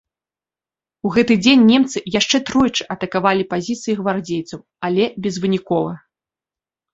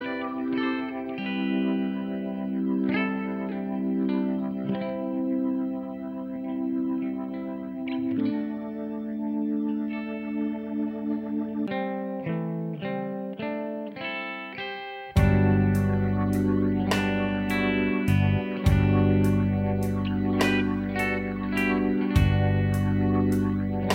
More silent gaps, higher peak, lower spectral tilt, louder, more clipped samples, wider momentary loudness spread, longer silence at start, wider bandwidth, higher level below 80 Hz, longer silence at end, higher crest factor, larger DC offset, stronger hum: neither; first, -2 dBFS vs -8 dBFS; second, -4.5 dB/octave vs -7.5 dB/octave; first, -17 LUFS vs -27 LUFS; neither; first, 14 LU vs 10 LU; first, 1.05 s vs 0 s; second, 8 kHz vs 16 kHz; second, -54 dBFS vs -40 dBFS; first, 0.95 s vs 0 s; about the same, 16 dB vs 18 dB; neither; neither